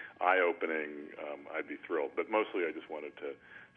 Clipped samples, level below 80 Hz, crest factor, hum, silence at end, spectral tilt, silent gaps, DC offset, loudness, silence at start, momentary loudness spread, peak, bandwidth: under 0.1%; -84 dBFS; 22 dB; none; 0.1 s; -6 dB/octave; none; under 0.1%; -35 LUFS; 0 s; 15 LU; -14 dBFS; 3.9 kHz